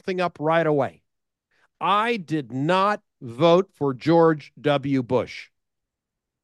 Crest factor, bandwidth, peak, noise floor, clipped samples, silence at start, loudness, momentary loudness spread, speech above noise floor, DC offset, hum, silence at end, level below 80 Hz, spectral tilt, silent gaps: 18 dB; 10.5 kHz; -6 dBFS; -84 dBFS; under 0.1%; 0.05 s; -22 LUFS; 10 LU; 63 dB; under 0.1%; none; 1 s; -68 dBFS; -7 dB/octave; none